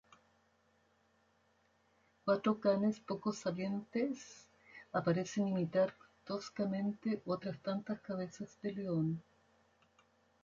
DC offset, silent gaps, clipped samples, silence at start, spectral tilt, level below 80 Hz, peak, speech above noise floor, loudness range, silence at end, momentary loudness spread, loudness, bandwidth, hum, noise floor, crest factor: under 0.1%; none; under 0.1%; 2.25 s; -7 dB/octave; -76 dBFS; -20 dBFS; 37 dB; 3 LU; 1.25 s; 11 LU; -38 LUFS; 7.6 kHz; none; -74 dBFS; 18 dB